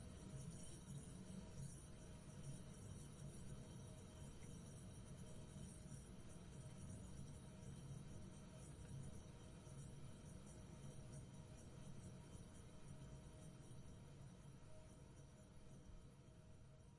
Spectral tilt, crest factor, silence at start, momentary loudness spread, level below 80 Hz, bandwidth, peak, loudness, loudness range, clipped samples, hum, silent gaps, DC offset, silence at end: -5.5 dB/octave; 14 dB; 0 s; 7 LU; -66 dBFS; 11.5 kHz; -44 dBFS; -59 LUFS; 4 LU; under 0.1%; none; none; under 0.1%; 0 s